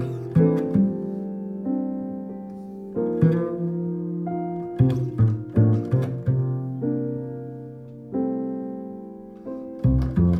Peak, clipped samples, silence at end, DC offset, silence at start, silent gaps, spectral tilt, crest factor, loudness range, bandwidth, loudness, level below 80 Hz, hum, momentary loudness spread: -6 dBFS; under 0.1%; 0 s; under 0.1%; 0 s; none; -11 dB/octave; 18 dB; 6 LU; 5 kHz; -25 LUFS; -40 dBFS; none; 16 LU